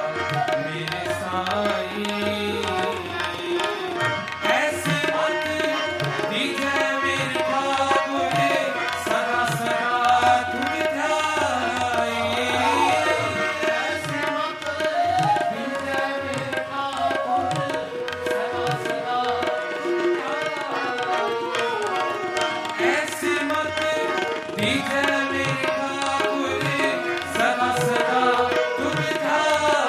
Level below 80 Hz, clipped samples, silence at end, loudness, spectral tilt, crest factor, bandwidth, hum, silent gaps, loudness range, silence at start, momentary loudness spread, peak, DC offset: -64 dBFS; under 0.1%; 0 s; -23 LUFS; -4 dB/octave; 18 dB; 16 kHz; none; none; 3 LU; 0 s; 6 LU; -6 dBFS; under 0.1%